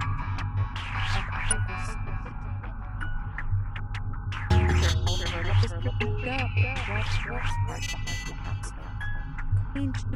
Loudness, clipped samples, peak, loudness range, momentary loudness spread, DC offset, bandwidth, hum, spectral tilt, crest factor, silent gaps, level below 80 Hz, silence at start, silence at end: -30 LUFS; under 0.1%; -10 dBFS; 5 LU; 11 LU; under 0.1%; 11.5 kHz; none; -4.5 dB/octave; 18 dB; none; -32 dBFS; 0 s; 0 s